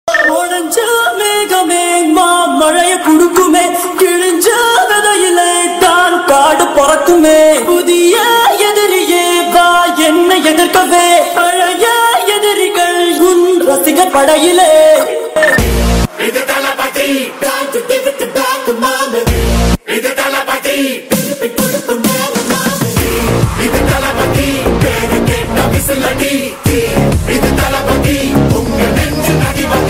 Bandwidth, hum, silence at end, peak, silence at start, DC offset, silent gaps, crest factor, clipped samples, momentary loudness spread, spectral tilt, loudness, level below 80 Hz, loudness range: 16.5 kHz; none; 0 s; 0 dBFS; 0.05 s; under 0.1%; none; 10 dB; under 0.1%; 6 LU; -4 dB/octave; -10 LUFS; -24 dBFS; 5 LU